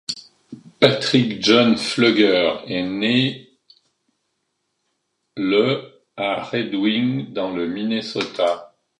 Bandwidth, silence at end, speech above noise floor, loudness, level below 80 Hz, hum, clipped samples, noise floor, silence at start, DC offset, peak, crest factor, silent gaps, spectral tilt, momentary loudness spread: 11.5 kHz; 0.35 s; 54 dB; -19 LUFS; -62 dBFS; none; under 0.1%; -73 dBFS; 0.1 s; under 0.1%; 0 dBFS; 20 dB; none; -5 dB/octave; 12 LU